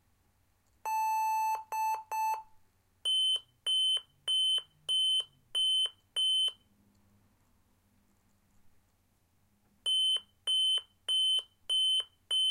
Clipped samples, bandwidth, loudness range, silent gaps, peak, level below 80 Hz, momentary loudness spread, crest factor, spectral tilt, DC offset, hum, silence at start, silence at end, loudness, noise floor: under 0.1%; 16 kHz; 7 LU; none; -24 dBFS; -76 dBFS; 7 LU; 10 dB; 3 dB/octave; under 0.1%; none; 0.85 s; 0 s; -29 LUFS; -72 dBFS